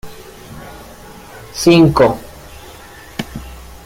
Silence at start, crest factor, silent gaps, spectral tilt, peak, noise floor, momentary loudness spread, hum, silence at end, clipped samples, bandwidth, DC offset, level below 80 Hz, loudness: 0.05 s; 16 dB; none; -6 dB/octave; 0 dBFS; -37 dBFS; 26 LU; none; 0.2 s; under 0.1%; 16.5 kHz; under 0.1%; -38 dBFS; -12 LUFS